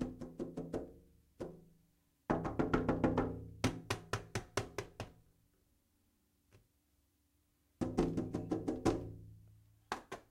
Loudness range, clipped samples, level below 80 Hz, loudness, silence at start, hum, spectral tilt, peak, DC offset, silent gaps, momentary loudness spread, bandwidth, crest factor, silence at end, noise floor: 10 LU; under 0.1%; -56 dBFS; -40 LUFS; 0 s; none; -6 dB/octave; -18 dBFS; under 0.1%; none; 16 LU; 16 kHz; 24 dB; 0.1 s; -77 dBFS